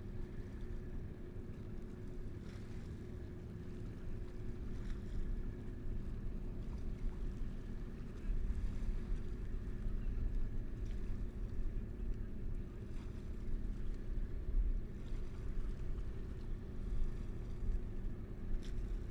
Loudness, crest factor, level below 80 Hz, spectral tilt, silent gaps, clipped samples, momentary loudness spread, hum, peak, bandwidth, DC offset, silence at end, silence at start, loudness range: -47 LUFS; 14 dB; -42 dBFS; -8 dB/octave; none; under 0.1%; 6 LU; none; -26 dBFS; 6.2 kHz; under 0.1%; 0 s; 0 s; 4 LU